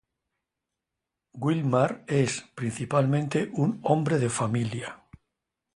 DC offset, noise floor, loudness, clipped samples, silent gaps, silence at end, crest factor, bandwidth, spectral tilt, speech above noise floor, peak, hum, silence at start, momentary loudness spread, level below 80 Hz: under 0.1%; -86 dBFS; -27 LUFS; under 0.1%; none; 0.8 s; 22 dB; 11.5 kHz; -6 dB/octave; 60 dB; -6 dBFS; none; 1.35 s; 8 LU; -62 dBFS